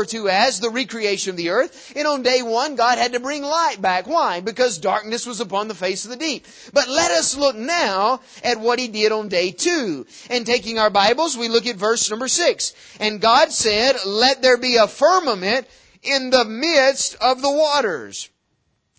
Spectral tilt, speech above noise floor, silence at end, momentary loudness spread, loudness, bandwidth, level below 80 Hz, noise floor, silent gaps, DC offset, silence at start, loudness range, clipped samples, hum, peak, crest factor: -1.5 dB/octave; 49 dB; 0.75 s; 9 LU; -18 LUFS; 8 kHz; -58 dBFS; -68 dBFS; none; under 0.1%; 0 s; 4 LU; under 0.1%; none; -2 dBFS; 18 dB